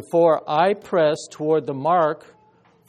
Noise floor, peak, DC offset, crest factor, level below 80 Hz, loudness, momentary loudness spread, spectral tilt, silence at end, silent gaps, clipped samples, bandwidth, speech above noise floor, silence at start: -56 dBFS; -4 dBFS; under 0.1%; 16 dB; -68 dBFS; -20 LUFS; 6 LU; -6 dB/octave; 0.7 s; none; under 0.1%; 11.5 kHz; 37 dB; 0 s